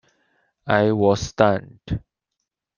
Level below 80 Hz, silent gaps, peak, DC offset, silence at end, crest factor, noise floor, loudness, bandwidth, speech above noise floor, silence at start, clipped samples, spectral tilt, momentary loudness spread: -46 dBFS; none; -2 dBFS; under 0.1%; 0.8 s; 20 dB; -81 dBFS; -21 LUFS; 9.8 kHz; 61 dB; 0.65 s; under 0.1%; -6 dB/octave; 13 LU